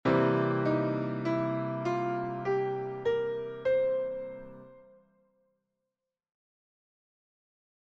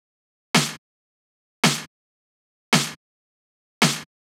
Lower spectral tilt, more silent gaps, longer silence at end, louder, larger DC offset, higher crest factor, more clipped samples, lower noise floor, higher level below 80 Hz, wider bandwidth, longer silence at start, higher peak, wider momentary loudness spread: first, -8.5 dB/octave vs -3 dB/octave; second, none vs 0.78-1.63 s, 1.87-2.72 s, 2.96-3.81 s; first, 3.05 s vs 0.3 s; second, -31 LUFS vs -22 LUFS; neither; about the same, 18 dB vs 22 dB; neither; about the same, -88 dBFS vs under -90 dBFS; first, -66 dBFS vs -78 dBFS; second, 7.4 kHz vs 18.5 kHz; second, 0.05 s vs 0.55 s; second, -14 dBFS vs -4 dBFS; about the same, 8 LU vs 9 LU